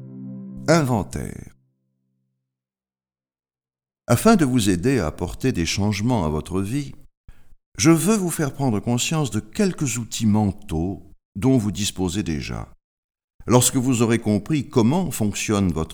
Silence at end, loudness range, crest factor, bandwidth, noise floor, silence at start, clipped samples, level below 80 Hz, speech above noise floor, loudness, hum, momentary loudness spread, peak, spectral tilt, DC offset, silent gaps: 0 s; 6 LU; 22 dB; over 20 kHz; under -90 dBFS; 0 s; under 0.1%; -42 dBFS; over 70 dB; -21 LUFS; none; 15 LU; 0 dBFS; -5 dB/octave; under 0.1%; 7.17-7.24 s, 7.66-7.72 s, 11.25-11.32 s, 12.84-13.09 s, 13.24-13.28 s, 13.34-13.39 s